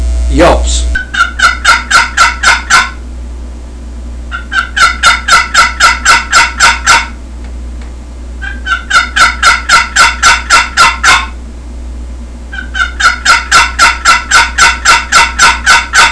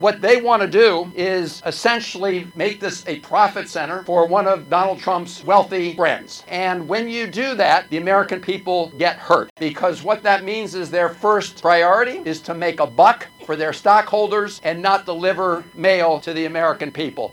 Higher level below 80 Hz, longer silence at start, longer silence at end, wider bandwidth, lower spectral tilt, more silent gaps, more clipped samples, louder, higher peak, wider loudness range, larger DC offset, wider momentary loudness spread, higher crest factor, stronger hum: first, -20 dBFS vs -66 dBFS; about the same, 0 s vs 0 s; about the same, 0 s vs 0 s; second, 11 kHz vs 18 kHz; second, -1.5 dB/octave vs -4.5 dB/octave; second, none vs 9.50-9.56 s; first, 3% vs under 0.1%; first, -6 LUFS vs -18 LUFS; about the same, 0 dBFS vs 0 dBFS; about the same, 3 LU vs 3 LU; neither; first, 21 LU vs 10 LU; second, 8 dB vs 18 dB; neither